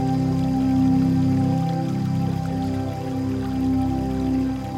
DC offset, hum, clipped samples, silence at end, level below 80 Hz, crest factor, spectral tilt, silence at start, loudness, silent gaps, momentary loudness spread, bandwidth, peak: under 0.1%; none; under 0.1%; 0 s; -38 dBFS; 12 dB; -8.5 dB/octave; 0 s; -22 LUFS; none; 7 LU; 13 kHz; -10 dBFS